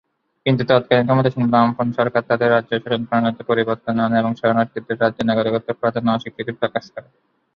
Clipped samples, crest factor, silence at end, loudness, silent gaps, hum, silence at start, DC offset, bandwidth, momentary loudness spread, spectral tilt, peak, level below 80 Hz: under 0.1%; 18 dB; 0.55 s; -19 LUFS; none; none; 0.45 s; under 0.1%; 6.4 kHz; 8 LU; -8.5 dB/octave; -2 dBFS; -56 dBFS